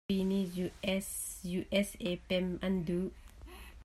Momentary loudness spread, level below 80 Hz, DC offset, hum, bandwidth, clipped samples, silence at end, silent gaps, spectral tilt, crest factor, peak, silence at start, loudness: 15 LU; -54 dBFS; under 0.1%; none; 15 kHz; under 0.1%; 0 s; none; -5 dB/octave; 18 dB; -16 dBFS; 0.1 s; -35 LUFS